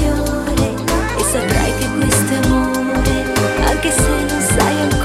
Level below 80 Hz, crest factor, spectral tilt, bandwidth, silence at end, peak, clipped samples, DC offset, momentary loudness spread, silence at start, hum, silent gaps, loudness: -24 dBFS; 14 dB; -4.5 dB/octave; 16 kHz; 0 s; 0 dBFS; under 0.1%; under 0.1%; 3 LU; 0 s; none; none; -16 LUFS